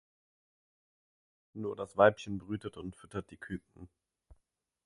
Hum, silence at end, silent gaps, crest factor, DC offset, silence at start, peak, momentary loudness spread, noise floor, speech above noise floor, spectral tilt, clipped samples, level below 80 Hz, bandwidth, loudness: none; 1 s; none; 28 dB; under 0.1%; 1.55 s; -10 dBFS; 18 LU; -80 dBFS; 46 dB; -6.5 dB/octave; under 0.1%; -64 dBFS; 11.5 kHz; -34 LUFS